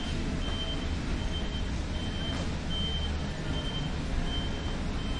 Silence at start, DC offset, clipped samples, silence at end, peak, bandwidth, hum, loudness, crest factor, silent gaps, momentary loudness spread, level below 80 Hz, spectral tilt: 0 s; under 0.1%; under 0.1%; 0 s; -18 dBFS; 11 kHz; none; -33 LUFS; 14 dB; none; 3 LU; -34 dBFS; -5 dB/octave